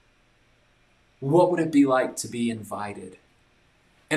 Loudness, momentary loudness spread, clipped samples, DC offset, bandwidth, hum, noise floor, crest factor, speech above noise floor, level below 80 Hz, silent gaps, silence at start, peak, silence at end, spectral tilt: -24 LUFS; 16 LU; under 0.1%; under 0.1%; 14 kHz; none; -62 dBFS; 20 dB; 39 dB; -66 dBFS; none; 1.2 s; -8 dBFS; 0 s; -5.5 dB/octave